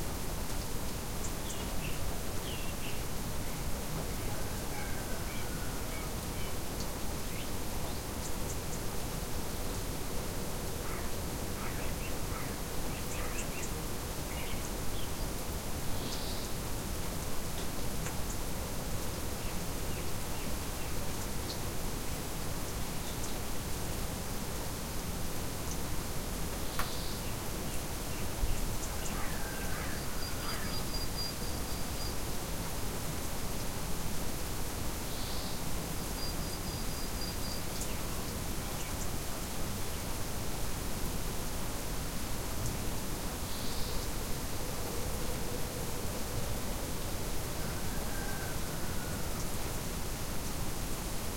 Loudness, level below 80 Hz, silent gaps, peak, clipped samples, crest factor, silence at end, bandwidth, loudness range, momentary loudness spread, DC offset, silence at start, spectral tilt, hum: -38 LUFS; -42 dBFS; none; -14 dBFS; under 0.1%; 20 dB; 0 s; 16.5 kHz; 1 LU; 1 LU; under 0.1%; 0 s; -4 dB/octave; none